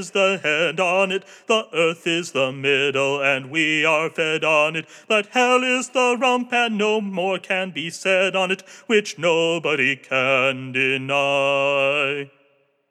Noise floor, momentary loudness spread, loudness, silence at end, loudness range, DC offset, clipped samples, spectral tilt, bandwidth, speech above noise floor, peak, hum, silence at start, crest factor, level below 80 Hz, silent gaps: -62 dBFS; 5 LU; -20 LUFS; 0.65 s; 2 LU; under 0.1%; under 0.1%; -3.5 dB/octave; 13 kHz; 41 dB; -4 dBFS; none; 0 s; 16 dB; under -90 dBFS; none